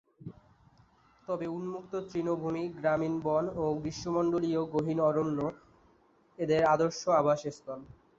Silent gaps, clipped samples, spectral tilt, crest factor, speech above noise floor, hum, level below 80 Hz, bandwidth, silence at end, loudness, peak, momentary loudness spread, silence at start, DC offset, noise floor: none; under 0.1%; -6.5 dB/octave; 18 dB; 35 dB; none; -62 dBFS; 7.8 kHz; 0.35 s; -31 LUFS; -14 dBFS; 15 LU; 0.2 s; under 0.1%; -65 dBFS